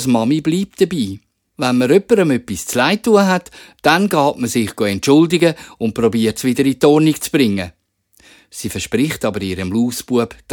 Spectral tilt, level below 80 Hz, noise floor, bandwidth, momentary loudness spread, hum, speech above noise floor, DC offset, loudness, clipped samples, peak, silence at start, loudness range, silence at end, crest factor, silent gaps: -5 dB/octave; -50 dBFS; -53 dBFS; 19.5 kHz; 10 LU; none; 37 dB; under 0.1%; -16 LUFS; under 0.1%; 0 dBFS; 0 s; 3 LU; 0 s; 16 dB; none